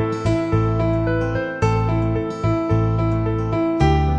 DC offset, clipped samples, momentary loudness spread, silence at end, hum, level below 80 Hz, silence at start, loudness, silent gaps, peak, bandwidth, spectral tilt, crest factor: under 0.1%; under 0.1%; 3 LU; 0 s; none; -30 dBFS; 0 s; -20 LUFS; none; -4 dBFS; 8.4 kHz; -8 dB/octave; 14 dB